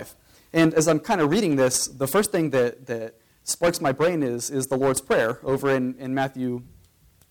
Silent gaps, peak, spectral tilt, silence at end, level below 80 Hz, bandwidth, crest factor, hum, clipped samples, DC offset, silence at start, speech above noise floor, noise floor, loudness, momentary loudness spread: none; -10 dBFS; -4.5 dB/octave; 0.65 s; -56 dBFS; 19 kHz; 14 dB; none; under 0.1%; under 0.1%; 0 s; 35 dB; -57 dBFS; -23 LUFS; 11 LU